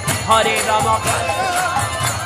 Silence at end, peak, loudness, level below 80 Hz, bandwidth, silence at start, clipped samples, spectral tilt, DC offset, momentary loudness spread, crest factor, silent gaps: 0 s; 0 dBFS; -16 LUFS; -40 dBFS; 15.5 kHz; 0 s; under 0.1%; -3 dB/octave; under 0.1%; 4 LU; 16 dB; none